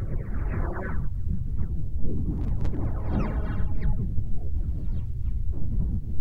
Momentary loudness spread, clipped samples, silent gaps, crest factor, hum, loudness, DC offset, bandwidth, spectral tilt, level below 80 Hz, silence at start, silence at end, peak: 4 LU; under 0.1%; none; 14 dB; none; -31 LUFS; under 0.1%; 3.4 kHz; -10 dB/octave; -28 dBFS; 0 s; 0 s; -10 dBFS